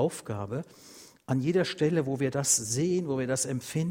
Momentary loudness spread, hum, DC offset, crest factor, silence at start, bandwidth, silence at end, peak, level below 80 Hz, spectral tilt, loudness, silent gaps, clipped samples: 12 LU; none; under 0.1%; 18 dB; 0 s; 16.5 kHz; 0 s; -12 dBFS; -64 dBFS; -4.5 dB/octave; -28 LUFS; none; under 0.1%